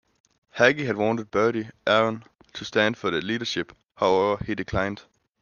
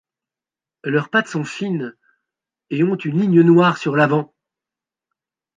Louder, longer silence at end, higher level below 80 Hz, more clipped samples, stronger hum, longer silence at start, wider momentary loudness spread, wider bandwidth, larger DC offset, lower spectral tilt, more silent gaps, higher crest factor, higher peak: second, -24 LUFS vs -18 LUFS; second, 0.4 s vs 1.35 s; first, -54 dBFS vs -68 dBFS; neither; neither; second, 0.55 s vs 0.85 s; about the same, 16 LU vs 15 LU; second, 7.2 kHz vs 9.2 kHz; neither; second, -5 dB/octave vs -7 dB/octave; first, 3.85-3.89 s vs none; about the same, 22 dB vs 18 dB; about the same, -2 dBFS vs -2 dBFS